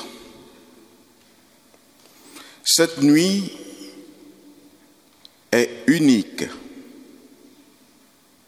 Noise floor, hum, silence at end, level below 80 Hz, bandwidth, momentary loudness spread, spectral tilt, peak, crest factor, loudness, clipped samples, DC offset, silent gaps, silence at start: -55 dBFS; none; 1.65 s; -66 dBFS; 15.5 kHz; 26 LU; -3.5 dB/octave; -2 dBFS; 22 dB; -19 LUFS; under 0.1%; under 0.1%; none; 0 s